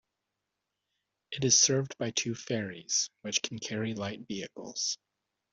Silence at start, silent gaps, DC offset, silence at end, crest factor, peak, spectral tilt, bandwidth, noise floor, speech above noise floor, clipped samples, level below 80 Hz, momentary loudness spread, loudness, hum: 1.3 s; none; under 0.1%; 0.6 s; 24 dB; -10 dBFS; -2.5 dB/octave; 8.2 kHz; -86 dBFS; 54 dB; under 0.1%; -70 dBFS; 17 LU; -30 LUFS; none